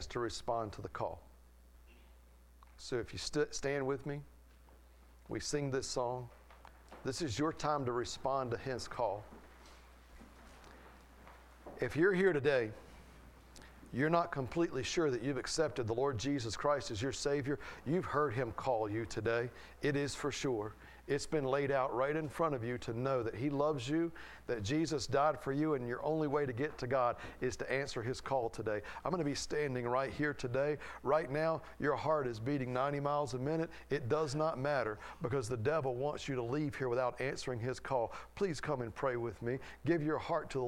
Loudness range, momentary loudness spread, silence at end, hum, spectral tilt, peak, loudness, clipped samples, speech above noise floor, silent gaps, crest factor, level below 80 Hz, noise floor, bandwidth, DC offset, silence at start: 6 LU; 8 LU; 0 s; none; -5.5 dB/octave; -16 dBFS; -37 LUFS; under 0.1%; 25 dB; none; 20 dB; -58 dBFS; -61 dBFS; 16 kHz; under 0.1%; 0 s